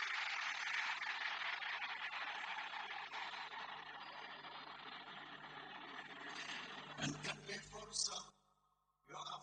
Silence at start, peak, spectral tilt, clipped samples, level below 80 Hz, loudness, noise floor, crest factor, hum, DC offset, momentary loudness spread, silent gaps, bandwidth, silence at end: 0 s; -26 dBFS; -1 dB/octave; under 0.1%; -78 dBFS; -45 LUFS; -81 dBFS; 22 dB; 50 Hz at -75 dBFS; under 0.1%; 11 LU; none; 9.6 kHz; 0 s